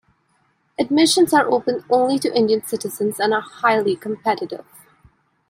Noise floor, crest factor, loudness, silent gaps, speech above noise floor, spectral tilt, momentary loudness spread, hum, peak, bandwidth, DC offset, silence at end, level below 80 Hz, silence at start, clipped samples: -64 dBFS; 18 dB; -19 LUFS; none; 45 dB; -3.5 dB/octave; 11 LU; none; -2 dBFS; 16 kHz; under 0.1%; 0.9 s; -64 dBFS; 0.8 s; under 0.1%